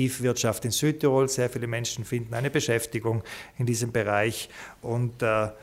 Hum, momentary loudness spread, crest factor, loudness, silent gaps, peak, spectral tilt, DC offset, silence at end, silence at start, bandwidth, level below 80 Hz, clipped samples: none; 8 LU; 16 dB; -27 LUFS; none; -10 dBFS; -4.5 dB/octave; under 0.1%; 0 s; 0 s; 16 kHz; -56 dBFS; under 0.1%